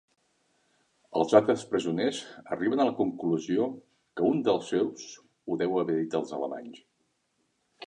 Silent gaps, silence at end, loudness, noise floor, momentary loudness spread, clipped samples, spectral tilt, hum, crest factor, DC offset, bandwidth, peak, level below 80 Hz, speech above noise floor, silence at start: none; 0 s; -28 LUFS; -75 dBFS; 19 LU; under 0.1%; -6 dB/octave; none; 24 dB; under 0.1%; 10.5 kHz; -6 dBFS; -72 dBFS; 47 dB; 1.1 s